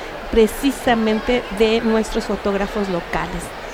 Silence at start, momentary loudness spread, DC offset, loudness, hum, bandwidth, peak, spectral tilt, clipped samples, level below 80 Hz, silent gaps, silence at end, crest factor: 0 s; 7 LU; under 0.1%; -19 LUFS; none; 16.5 kHz; -4 dBFS; -5 dB/octave; under 0.1%; -34 dBFS; none; 0 s; 16 dB